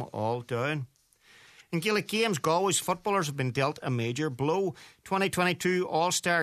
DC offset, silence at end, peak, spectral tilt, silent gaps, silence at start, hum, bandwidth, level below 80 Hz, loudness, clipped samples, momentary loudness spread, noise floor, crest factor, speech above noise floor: under 0.1%; 0 s; -10 dBFS; -4 dB/octave; none; 0 s; none; 14 kHz; -66 dBFS; -29 LUFS; under 0.1%; 7 LU; -60 dBFS; 20 dB; 31 dB